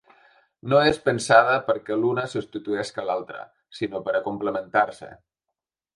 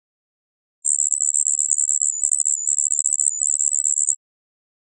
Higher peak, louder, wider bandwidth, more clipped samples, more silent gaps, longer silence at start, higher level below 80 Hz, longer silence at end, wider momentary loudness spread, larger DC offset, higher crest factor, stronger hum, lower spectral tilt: about the same, 0 dBFS vs 0 dBFS; second, -23 LUFS vs -17 LUFS; first, 11.5 kHz vs 9 kHz; neither; neither; second, 0.65 s vs 0.85 s; first, -60 dBFS vs under -90 dBFS; about the same, 0.8 s vs 0.85 s; first, 17 LU vs 3 LU; neither; about the same, 24 dB vs 22 dB; neither; first, -5 dB/octave vs 8.5 dB/octave